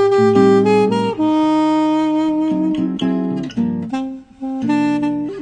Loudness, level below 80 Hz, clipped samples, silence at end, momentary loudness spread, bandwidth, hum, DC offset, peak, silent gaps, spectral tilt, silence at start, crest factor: -16 LUFS; -52 dBFS; under 0.1%; 0 s; 11 LU; 9.4 kHz; none; under 0.1%; -2 dBFS; none; -7.5 dB/octave; 0 s; 14 dB